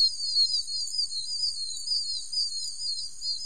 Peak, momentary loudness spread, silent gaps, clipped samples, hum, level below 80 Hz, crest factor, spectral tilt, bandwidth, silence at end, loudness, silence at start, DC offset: -14 dBFS; 8 LU; none; under 0.1%; none; -64 dBFS; 16 dB; 3 dB/octave; 15.5 kHz; 0 s; -27 LUFS; 0 s; 1%